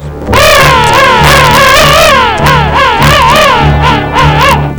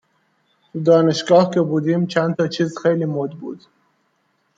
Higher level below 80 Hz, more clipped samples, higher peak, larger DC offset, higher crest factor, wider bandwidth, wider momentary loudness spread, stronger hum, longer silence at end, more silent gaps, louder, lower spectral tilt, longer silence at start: first, -18 dBFS vs -66 dBFS; first, 8% vs under 0.1%; about the same, 0 dBFS vs -2 dBFS; first, 3% vs under 0.1%; second, 4 dB vs 18 dB; first, over 20 kHz vs 7.8 kHz; second, 4 LU vs 18 LU; neither; second, 0 s vs 1 s; neither; first, -4 LUFS vs -18 LUFS; second, -4 dB/octave vs -6.5 dB/octave; second, 0 s vs 0.75 s